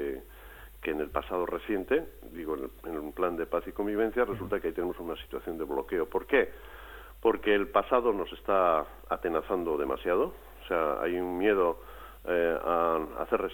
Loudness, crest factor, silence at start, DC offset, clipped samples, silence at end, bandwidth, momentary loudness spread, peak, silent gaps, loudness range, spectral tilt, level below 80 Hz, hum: -30 LUFS; 20 dB; 0 s; under 0.1%; under 0.1%; 0 s; 17.5 kHz; 15 LU; -10 dBFS; none; 4 LU; -6.5 dB/octave; -52 dBFS; none